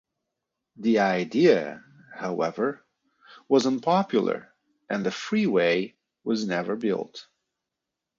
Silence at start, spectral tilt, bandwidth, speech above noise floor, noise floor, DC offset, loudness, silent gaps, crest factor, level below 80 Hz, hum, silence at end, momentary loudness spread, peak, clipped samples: 0.8 s; -6 dB/octave; 7.8 kHz; 62 dB; -86 dBFS; under 0.1%; -25 LUFS; none; 20 dB; -72 dBFS; none; 0.95 s; 16 LU; -6 dBFS; under 0.1%